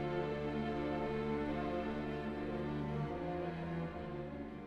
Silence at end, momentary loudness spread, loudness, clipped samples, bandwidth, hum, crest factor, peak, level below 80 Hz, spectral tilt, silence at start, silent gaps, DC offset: 0 s; 5 LU; -40 LUFS; under 0.1%; 8.6 kHz; none; 12 dB; -26 dBFS; -54 dBFS; -8.5 dB/octave; 0 s; none; under 0.1%